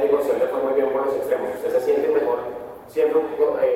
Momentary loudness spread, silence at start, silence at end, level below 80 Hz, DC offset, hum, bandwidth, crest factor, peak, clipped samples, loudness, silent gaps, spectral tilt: 6 LU; 0 s; 0 s; -60 dBFS; under 0.1%; none; 16 kHz; 14 dB; -6 dBFS; under 0.1%; -22 LUFS; none; -5.5 dB/octave